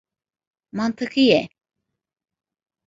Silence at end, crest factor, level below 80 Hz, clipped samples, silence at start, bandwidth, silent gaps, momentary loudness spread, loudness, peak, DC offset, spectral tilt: 1.4 s; 22 dB; -66 dBFS; under 0.1%; 0.75 s; 7.8 kHz; none; 17 LU; -20 LUFS; -2 dBFS; under 0.1%; -5.5 dB/octave